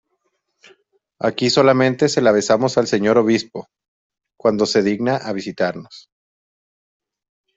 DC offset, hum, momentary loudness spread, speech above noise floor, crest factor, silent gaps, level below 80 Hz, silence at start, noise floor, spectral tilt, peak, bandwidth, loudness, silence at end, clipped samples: under 0.1%; none; 9 LU; 54 dB; 18 dB; 3.88-4.10 s; -60 dBFS; 1.2 s; -71 dBFS; -5 dB/octave; -2 dBFS; 8.2 kHz; -17 LUFS; 1.6 s; under 0.1%